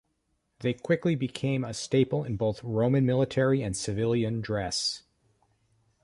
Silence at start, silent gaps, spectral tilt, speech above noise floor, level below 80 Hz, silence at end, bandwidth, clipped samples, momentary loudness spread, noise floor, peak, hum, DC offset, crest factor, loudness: 0.6 s; none; -5.5 dB/octave; 48 dB; -56 dBFS; 1.05 s; 11.5 kHz; under 0.1%; 6 LU; -75 dBFS; -12 dBFS; none; under 0.1%; 18 dB; -28 LUFS